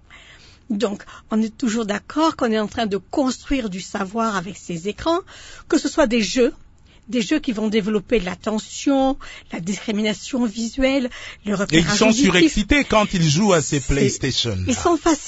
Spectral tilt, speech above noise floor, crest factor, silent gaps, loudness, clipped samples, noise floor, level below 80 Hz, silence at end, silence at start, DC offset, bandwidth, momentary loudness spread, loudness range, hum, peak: -4.5 dB/octave; 26 dB; 20 dB; none; -20 LUFS; under 0.1%; -46 dBFS; -38 dBFS; 0 s; 0.1 s; under 0.1%; 8 kHz; 11 LU; 6 LU; none; 0 dBFS